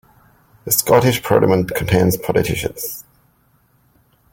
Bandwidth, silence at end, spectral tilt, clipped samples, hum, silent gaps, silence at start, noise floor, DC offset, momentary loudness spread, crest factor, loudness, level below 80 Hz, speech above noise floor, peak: 17 kHz; 1.3 s; -5 dB/octave; under 0.1%; none; none; 0.65 s; -58 dBFS; under 0.1%; 13 LU; 18 dB; -16 LUFS; -42 dBFS; 42 dB; 0 dBFS